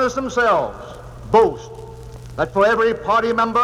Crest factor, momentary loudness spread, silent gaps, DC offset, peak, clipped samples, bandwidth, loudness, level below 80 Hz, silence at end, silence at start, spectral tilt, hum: 16 dB; 21 LU; none; under 0.1%; -2 dBFS; under 0.1%; 12 kHz; -18 LUFS; -42 dBFS; 0 s; 0 s; -5 dB/octave; none